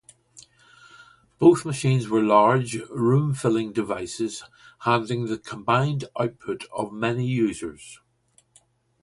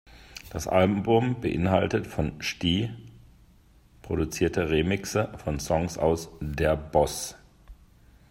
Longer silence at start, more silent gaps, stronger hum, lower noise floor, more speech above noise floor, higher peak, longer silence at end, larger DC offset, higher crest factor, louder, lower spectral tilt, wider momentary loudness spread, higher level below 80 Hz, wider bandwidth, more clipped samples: first, 0.35 s vs 0.15 s; neither; neither; first, -63 dBFS vs -57 dBFS; first, 40 dB vs 31 dB; first, -4 dBFS vs -8 dBFS; first, 1.05 s vs 0.55 s; neither; about the same, 20 dB vs 20 dB; first, -23 LUFS vs -27 LUFS; about the same, -6.5 dB/octave vs -5.5 dB/octave; about the same, 13 LU vs 11 LU; second, -60 dBFS vs -44 dBFS; second, 11.5 kHz vs 16 kHz; neither